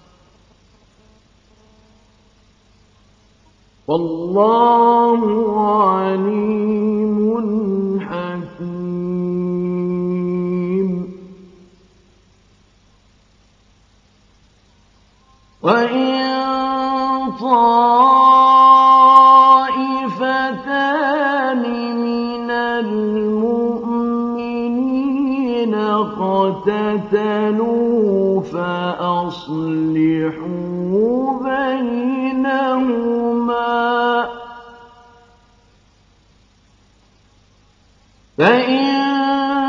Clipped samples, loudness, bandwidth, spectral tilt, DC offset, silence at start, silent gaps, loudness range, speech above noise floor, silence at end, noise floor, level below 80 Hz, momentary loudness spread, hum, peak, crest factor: under 0.1%; -16 LUFS; 7.2 kHz; -7.5 dB/octave; under 0.1%; 3.9 s; none; 13 LU; 39 dB; 0 s; -53 dBFS; -56 dBFS; 12 LU; none; 0 dBFS; 18 dB